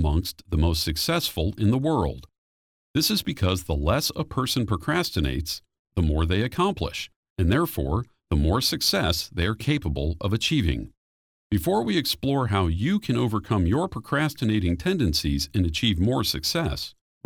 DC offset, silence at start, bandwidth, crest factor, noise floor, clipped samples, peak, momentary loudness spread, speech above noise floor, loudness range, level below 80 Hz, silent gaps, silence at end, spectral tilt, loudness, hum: under 0.1%; 0 s; over 20 kHz; 18 dB; under -90 dBFS; under 0.1%; -8 dBFS; 7 LU; over 66 dB; 2 LU; -34 dBFS; 2.38-2.94 s, 5.79-5.85 s, 7.16-7.23 s, 7.30-7.36 s, 10.97-11.50 s; 0.35 s; -5 dB/octave; -25 LUFS; none